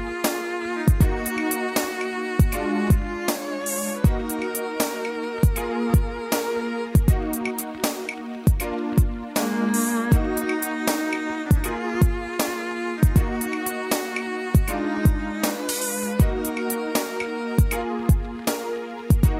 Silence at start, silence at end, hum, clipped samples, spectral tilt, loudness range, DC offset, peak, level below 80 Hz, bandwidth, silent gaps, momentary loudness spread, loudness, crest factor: 0 s; 0 s; none; under 0.1%; -5.5 dB/octave; 1 LU; under 0.1%; -6 dBFS; -28 dBFS; 16 kHz; none; 6 LU; -24 LUFS; 16 dB